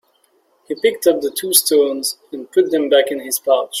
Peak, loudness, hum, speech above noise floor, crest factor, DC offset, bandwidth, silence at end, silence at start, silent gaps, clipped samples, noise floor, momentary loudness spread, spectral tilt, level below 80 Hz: 0 dBFS; -16 LUFS; none; 43 dB; 18 dB; under 0.1%; 16.5 kHz; 0 s; 0.7 s; none; under 0.1%; -60 dBFS; 9 LU; -1.5 dB/octave; -66 dBFS